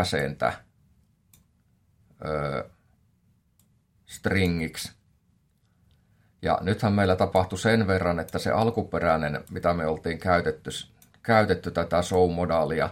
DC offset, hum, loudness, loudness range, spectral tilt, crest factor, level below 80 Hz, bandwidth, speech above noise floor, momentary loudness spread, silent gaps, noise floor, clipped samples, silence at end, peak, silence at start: under 0.1%; none; -26 LUFS; 10 LU; -6 dB/octave; 22 dB; -54 dBFS; 16.5 kHz; 41 dB; 13 LU; none; -66 dBFS; under 0.1%; 0 s; -6 dBFS; 0 s